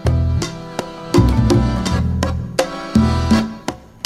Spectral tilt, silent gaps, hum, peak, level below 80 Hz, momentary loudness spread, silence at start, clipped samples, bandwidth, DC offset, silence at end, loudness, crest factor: -6.5 dB/octave; none; none; 0 dBFS; -24 dBFS; 13 LU; 0 s; under 0.1%; 14 kHz; under 0.1%; 0.25 s; -18 LUFS; 16 dB